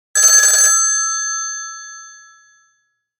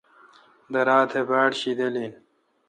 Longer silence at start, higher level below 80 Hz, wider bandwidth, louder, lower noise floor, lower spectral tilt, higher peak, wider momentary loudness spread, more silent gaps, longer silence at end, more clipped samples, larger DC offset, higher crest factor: second, 0.15 s vs 0.7 s; about the same, -78 dBFS vs -78 dBFS; first, 19 kHz vs 9.8 kHz; first, -11 LUFS vs -23 LUFS; first, -66 dBFS vs -54 dBFS; second, 7 dB/octave vs -4.5 dB/octave; first, 0 dBFS vs -6 dBFS; first, 22 LU vs 11 LU; neither; first, 1.1 s vs 0.55 s; neither; neither; about the same, 16 dB vs 20 dB